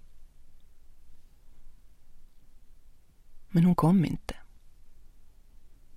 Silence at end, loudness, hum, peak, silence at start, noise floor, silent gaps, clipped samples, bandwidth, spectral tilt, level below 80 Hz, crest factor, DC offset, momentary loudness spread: 0 s; -26 LUFS; none; -12 dBFS; 0.1 s; -51 dBFS; none; under 0.1%; 14.5 kHz; -8.5 dB/octave; -50 dBFS; 20 dB; under 0.1%; 21 LU